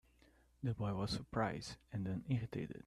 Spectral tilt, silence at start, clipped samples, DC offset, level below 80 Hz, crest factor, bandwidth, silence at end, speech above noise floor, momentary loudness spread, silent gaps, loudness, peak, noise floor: -6.5 dB/octave; 0.6 s; under 0.1%; under 0.1%; -62 dBFS; 18 dB; 12.5 kHz; 0.05 s; 29 dB; 6 LU; none; -42 LUFS; -22 dBFS; -70 dBFS